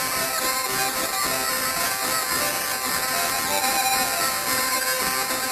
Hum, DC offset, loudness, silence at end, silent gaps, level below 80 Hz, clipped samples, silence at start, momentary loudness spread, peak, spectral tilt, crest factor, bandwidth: none; under 0.1%; -22 LUFS; 0 s; none; -52 dBFS; under 0.1%; 0 s; 2 LU; -6 dBFS; -0.5 dB/octave; 18 dB; 14 kHz